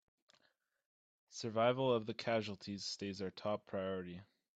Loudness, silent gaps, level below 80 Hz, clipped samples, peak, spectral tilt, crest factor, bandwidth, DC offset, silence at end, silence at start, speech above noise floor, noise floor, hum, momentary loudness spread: -39 LUFS; none; -82 dBFS; under 0.1%; -20 dBFS; -5 dB/octave; 22 dB; 9 kHz; under 0.1%; 0.35 s; 1.3 s; 40 dB; -80 dBFS; none; 12 LU